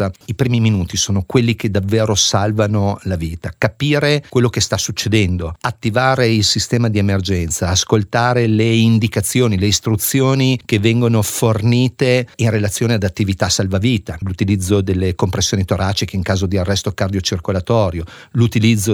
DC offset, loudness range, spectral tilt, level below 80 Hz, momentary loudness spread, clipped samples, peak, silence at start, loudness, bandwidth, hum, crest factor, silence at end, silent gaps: under 0.1%; 3 LU; -5 dB/octave; -38 dBFS; 6 LU; under 0.1%; 0 dBFS; 0 s; -16 LUFS; 19 kHz; none; 16 dB; 0 s; none